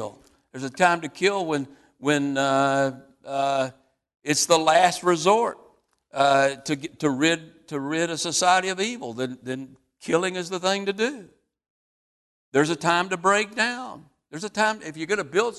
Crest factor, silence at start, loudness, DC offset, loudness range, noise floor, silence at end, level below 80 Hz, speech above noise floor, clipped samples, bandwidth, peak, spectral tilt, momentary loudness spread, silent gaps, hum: 20 dB; 0 s; -23 LUFS; under 0.1%; 5 LU; -58 dBFS; 0 s; -68 dBFS; 35 dB; under 0.1%; 12.5 kHz; -4 dBFS; -3.5 dB/octave; 15 LU; 4.15-4.20 s, 11.70-12.52 s; none